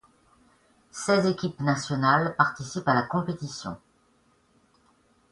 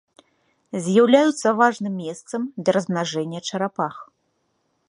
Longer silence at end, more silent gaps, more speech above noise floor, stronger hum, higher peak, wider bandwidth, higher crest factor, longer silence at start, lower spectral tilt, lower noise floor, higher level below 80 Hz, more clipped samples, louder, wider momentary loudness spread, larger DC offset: first, 1.55 s vs 0.85 s; neither; second, 39 dB vs 50 dB; neither; about the same, -4 dBFS vs -2 dBFS; about the same, 11.5 kHz vs 11 kHz; about the same, 24 dB vs 20 dB; first, 0.95 s vs 0.75 s; about the same, -5.5 dB/octave vs -5 dB/octave; second, -65 dBFS vs -70 dBFS; first, -62 dBFS vs -72 dBFS; neither; second, -26 LUFS vs -21 LUFS; about the same, 14 LU vs 14 LU; neither